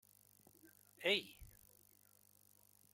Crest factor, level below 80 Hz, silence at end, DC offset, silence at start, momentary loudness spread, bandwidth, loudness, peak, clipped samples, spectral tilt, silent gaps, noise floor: 26 dB; -74 dBFS; 1.45 s; under 0.1%; 1 s; 28 LU; 16.5 kHz; -39 LUFS; -22 dBFS; under 0.1%; -2.5 dB/octave; none; -70 dBFS